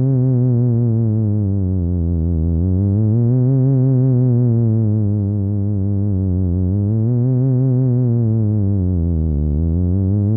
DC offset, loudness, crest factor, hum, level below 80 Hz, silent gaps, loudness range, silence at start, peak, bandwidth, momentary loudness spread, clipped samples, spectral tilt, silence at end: under 0.1%; -17 LUFS; 8 dB; none; -30 dBFS; none; 2 LU; 0 s; -8 dBFS; 1.6 kHz; 4 LU; under 0.1%; -16.5 dB/octave; 0 s